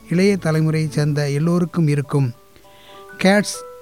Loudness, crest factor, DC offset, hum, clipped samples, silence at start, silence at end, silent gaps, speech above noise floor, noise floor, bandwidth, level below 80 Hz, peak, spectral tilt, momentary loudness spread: -19 LUFS; 14 dB; 0.3%; none; under 0.1%; 0.05 s; 0 s; none; 29 dB; -47 dBFS; 15.5 kHz; -54 dBFS; -4 dBFS; -6.5 dB/octave; 5 LU